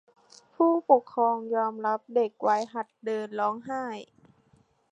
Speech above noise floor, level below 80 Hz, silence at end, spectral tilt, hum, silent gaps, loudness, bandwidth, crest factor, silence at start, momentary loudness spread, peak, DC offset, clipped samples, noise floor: 38 dB; -80 dBFS; 0.9 s; -6 dB/octave; none; none; -27 LUFS; 9.2 kHz; 22 dB; 0.6 s; 12 LU; -6 dBFS; under 0.1%; under 0.1%; -65 dBFS